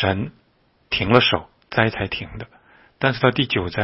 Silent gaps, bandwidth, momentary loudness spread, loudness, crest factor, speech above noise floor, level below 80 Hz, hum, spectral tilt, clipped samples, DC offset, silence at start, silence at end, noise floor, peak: none; 6 kHz; 17 LU; -20 LUFS; 22 dB; 41 dB; -46 dBFS; none; -8.5 dB/octave; under 0.1%; under 0.1%; 0 s; 0 s; -61 dBFS; 0 dBFS